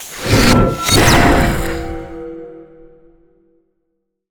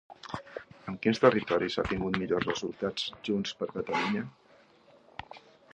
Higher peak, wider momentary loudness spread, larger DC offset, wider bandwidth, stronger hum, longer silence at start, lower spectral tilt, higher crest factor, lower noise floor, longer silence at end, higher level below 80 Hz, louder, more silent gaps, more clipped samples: first, 0 dBFS vs -6 dBFS; about the same, 20 LU vs 21 LU; neither; first, over 20 kHz vs 9.2 kHz; neither; about the same, 0 s vs 0.1 s; about the same, -4.5 dB/octave vs -5.5 dB/octave; second, 16 dB vs 26 dB; first, -70 dBFS vs -60 dBFS; first, 1.7 s vs 0.4 s; first, -24 dBFS vs -56 dBFS; first, -12 LUFS vs -30 LUFS; neither; neither